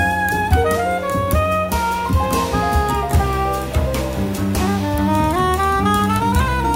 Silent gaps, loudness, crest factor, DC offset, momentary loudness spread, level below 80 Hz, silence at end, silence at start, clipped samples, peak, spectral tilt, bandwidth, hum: none; -18 LUFS; 16 dB; under 0.1%; 4 LU; -26 dBFS; 0 s; 0 s; under 0.1%; -2 dBFS; -5.5 dB/octave; 16.5 kHz; none